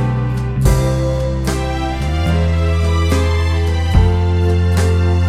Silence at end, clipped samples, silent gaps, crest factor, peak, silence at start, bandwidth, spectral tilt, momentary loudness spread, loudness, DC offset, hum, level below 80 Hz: 0 s; under 0.1%; none; 14 dB; 0 dBFS; 0 s; 13.5 kHz; -6.5 dB/octave; 5 LU; -16 LUFS; under 0.1%; none; -20 dBFS